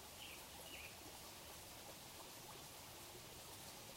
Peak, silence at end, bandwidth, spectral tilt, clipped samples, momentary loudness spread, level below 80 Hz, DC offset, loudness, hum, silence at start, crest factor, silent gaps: -40 dBFS; 0 s; 16 kHz; -2 dB/octave; under 0.1%; 2 LU; -72 dBFS; under 0.1%; -54 LUFS; none; 0 s; 16 dB; none